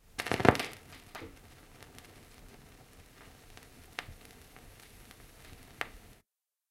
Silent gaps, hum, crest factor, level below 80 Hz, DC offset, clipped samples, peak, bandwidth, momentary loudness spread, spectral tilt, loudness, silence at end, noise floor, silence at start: none; none; 36 dB; -58 dBFS; under 0.1%; under 0.1%; -2 dBFS; 16.5 kHz; 28 LU; -5 dB/octave; -33 LUFS; 0.7 s; -79 dBFS; 0.2 s